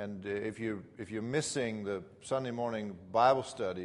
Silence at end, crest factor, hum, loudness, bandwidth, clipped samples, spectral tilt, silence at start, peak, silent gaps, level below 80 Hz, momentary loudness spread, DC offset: 0 s; 20 dB; none; -34 LUFS; 11.5 kHz; under 0.1%; -5 dB/octave; 0 s; -14 dBFS; none; -70 dBFS; 12 LU; under 0.1%